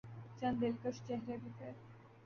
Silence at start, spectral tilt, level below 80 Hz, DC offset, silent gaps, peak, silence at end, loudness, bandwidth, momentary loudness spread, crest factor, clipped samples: 0.05 s; -6.5 dB/octave; -72 dBFS; under 0.1%; none; -24 dBFS; 0 s; -42 LUFS; 7 kHz; 17 LU; 18 dB; under 0.1%